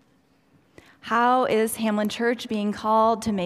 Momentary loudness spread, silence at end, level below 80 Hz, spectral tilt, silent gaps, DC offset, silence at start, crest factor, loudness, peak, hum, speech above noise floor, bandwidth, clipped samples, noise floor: 7 LU; 0 s; -60 dBFS; -4.5 dB/octave; none; under 0.1%; 1.05 s; 16 dB; -23 LUFS; -8 dBFS; none; 40 dB; 15.5 kHz; under 0.1%; -62 dBFS